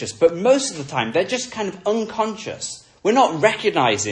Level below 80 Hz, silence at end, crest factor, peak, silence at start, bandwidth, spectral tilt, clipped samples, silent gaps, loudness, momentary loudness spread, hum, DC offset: -60 dBFS; 0 s; 18 dB; -2 dBFS; 0 s; 10.5 kHz; -3.5 dB/octave; under 0.1%; none; -20 LUFS; 11 LU; none; under 0.1%